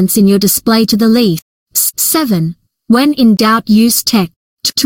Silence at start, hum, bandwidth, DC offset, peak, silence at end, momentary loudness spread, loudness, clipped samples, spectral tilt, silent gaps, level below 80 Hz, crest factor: 0 s; none; 17 kHz; under 0.1%; 0 dBFS; 0 s; 8 LU; -10 LUFS; under 0.1%; -4 dB/octave; 1.42-1.66 s, 4.36-4.57 s; -48 dBFS; 10 dB